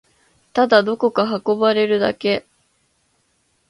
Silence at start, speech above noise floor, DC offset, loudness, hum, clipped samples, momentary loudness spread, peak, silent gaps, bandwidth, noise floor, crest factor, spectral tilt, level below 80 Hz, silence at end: 0.55 s; 48 dB; under 0.1%; -18 LUFS; none; under 0.1%; 7 LU; 0 dBFS; none; 11 kHz; -65 dBFS; 20 dB; -6 dB/octave; -62 dBFS; 1.3 s